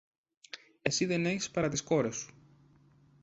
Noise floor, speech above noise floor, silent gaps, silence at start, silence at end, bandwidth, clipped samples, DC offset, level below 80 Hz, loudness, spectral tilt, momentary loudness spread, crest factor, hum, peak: -63 dBFS; 31 dB; none; 0.55 s; 0.95 s; 8.2 kHz; under 0.1%; under 0.1%; -64 dBFS; -32 LUFS; -4 dB/octave; 18 LU; 24 dB; none; -12 dBFS